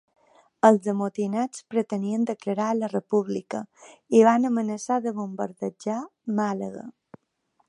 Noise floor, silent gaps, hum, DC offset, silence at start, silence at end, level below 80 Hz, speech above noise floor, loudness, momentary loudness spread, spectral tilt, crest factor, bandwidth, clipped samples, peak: -71 dBFS; none; none; under 0.1%; 0.65 s; 0.8 s; -78 dBFS; 46 dB; -25 LUFS; 13 LU; -6.5 dB/octave; 22 dB; 11 kHz; under 0.1%; -2 dBFS